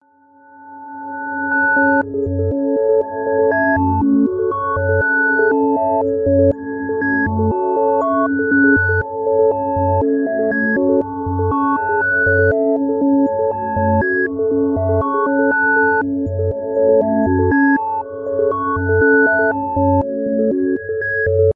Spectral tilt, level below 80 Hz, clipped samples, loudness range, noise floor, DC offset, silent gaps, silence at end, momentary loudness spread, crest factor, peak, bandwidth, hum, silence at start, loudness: -12 dB/octave; -46 dBFS; under 0.1%; 1 LU; -49 dBFS; under 0.1%; none; 0.05 s; 6 LU; 14 dB; -2 dBFS; 2.8 kHz; none; 0.6 s; -16 LUFS